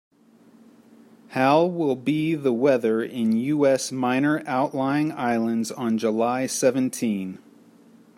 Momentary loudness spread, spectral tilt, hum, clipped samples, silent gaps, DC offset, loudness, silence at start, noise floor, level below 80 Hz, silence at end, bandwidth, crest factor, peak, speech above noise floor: 6 LU; -5.5 dB/octave; none; under 0.1%; none; under 0.1%; -23 LUFS; 1.3 s; -54 dBFS; -70 dBFS; 0.8 s; 16 kHz; 18 dB; -6 dBFS; 32 dB